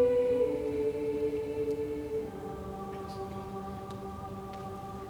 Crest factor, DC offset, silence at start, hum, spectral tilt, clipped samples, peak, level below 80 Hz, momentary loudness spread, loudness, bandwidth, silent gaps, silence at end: 16 dB; under 0.1%; 0 s; none; -7.5 dB/octave; under 0.1%; -16 dBFS; -54 dBFS; 12 LU; -35 LUFS; 20 kHz; none; 0 s